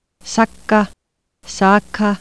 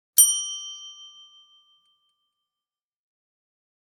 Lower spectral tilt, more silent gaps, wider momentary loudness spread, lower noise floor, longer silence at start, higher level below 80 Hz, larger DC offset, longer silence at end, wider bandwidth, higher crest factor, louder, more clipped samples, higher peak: first, -5 dB/octave vs 9 dB/octave; neither; second, 10 LU vs 25 LU; second, -52 dBFS vs under -90 dBFS; about the same, 0.25 s vs 0.15 s; first, -48 dBFS vs under -90 dBFS; neither; second, 0.05 s vs 2.9 s; second, 11 kHz vs 18 kHz; second, 16 dB vs 30 dB; first, -16 LUFS vs -19 LUFS; neither; about the same, 0 dBFS vs 0 dBFS